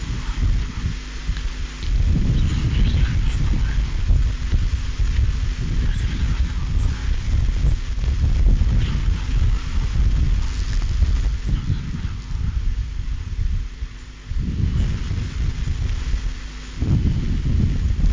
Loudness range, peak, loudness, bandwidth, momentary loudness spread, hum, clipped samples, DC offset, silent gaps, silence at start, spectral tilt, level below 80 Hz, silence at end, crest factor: 4 LU; -6 dBFS; -23 LUFS; 7.6 kHz; 8 LU; none; under 0.1%; under 0.1%; none; 0 s; -6.5 dB/octave; -20 dBFS; 0 s; 12 dB